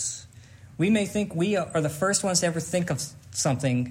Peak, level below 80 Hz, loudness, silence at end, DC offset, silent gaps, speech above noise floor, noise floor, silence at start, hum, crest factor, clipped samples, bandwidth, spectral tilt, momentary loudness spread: -10 dBFS; -60 dBFS; -26 LUFS; 0 s; under 0.1%; none; 23 dB; -48 dBFS; 0 s; none; 18 dB; under 0.1%; 16 kHz; -4.5 dB/octave; 8 LU